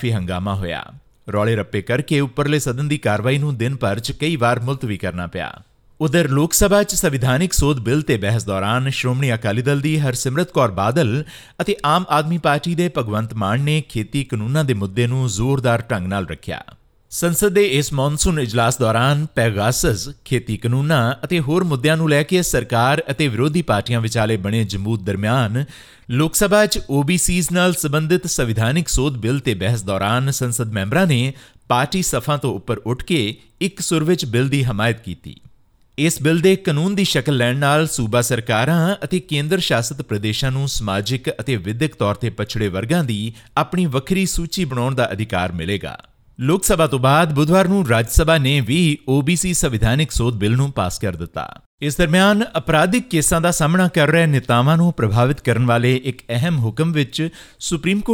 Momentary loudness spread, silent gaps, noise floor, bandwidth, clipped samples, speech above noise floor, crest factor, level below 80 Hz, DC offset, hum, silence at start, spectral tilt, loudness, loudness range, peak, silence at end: 8 LU; 51.66-51.78 s; -51 dBFS; 18.5 kHz; under 0.1%; 34 dB; 18 dB; -36 dBFS; under 0.1%; none; 0 s; -5 dB/octave; -18 LUFS; 4 LU; 0 dBFS; 0 s